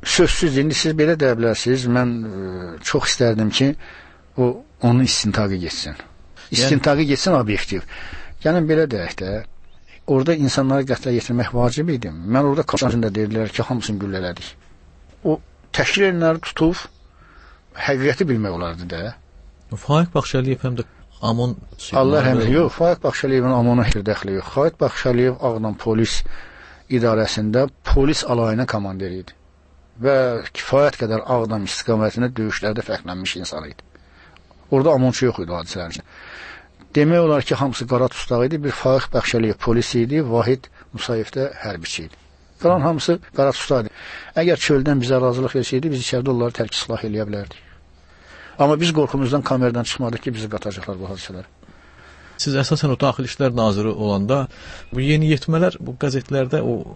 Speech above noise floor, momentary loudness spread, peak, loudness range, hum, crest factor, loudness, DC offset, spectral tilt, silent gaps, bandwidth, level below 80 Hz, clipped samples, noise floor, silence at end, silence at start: 32 dB; 13 LU; -4 dBFS; 4 LU; none; 16 dB; -20 LUFS; under 0.1%; -5.5 dB/octave; none; 8.8 kHz; -36 dBFS; under 0.1%; -51 dBFS; 0 s; 0 s